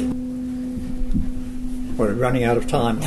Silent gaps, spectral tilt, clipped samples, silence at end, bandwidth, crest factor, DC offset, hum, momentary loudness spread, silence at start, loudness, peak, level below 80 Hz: none; -6.5 dB/octave; under 0.1%; 0 s; 12.5 kHz; 16 dB; under 0.1%; none; 10 LU; 0 s; -24 LUFS; -6 dBFS; -28 dBFS